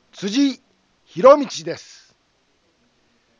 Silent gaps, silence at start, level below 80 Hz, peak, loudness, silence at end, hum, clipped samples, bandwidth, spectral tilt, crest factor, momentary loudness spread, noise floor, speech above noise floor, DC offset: none; 0.2 s; -66 dBFS; 0 dBFS; -17 LUFS; 1.6 s; none; under 0.1%; 7.6 kHz; -4.5 dB/octave; 20 dB; 22 LU; -64 dBFS; 48 dB; under 0.1%